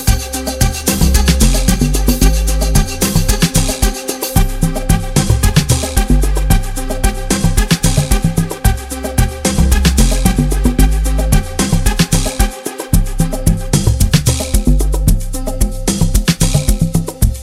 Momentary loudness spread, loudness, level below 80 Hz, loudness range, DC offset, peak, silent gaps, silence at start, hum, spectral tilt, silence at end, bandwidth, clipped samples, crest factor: 5 LU; -14 LUFS; -14 dBFS; 2 LU; under 0.1%; 0 dBFS; none; 0 s; none; -4.5 dB/octave; 0 s; 16.5 kHz; under 0.1%; 12 dB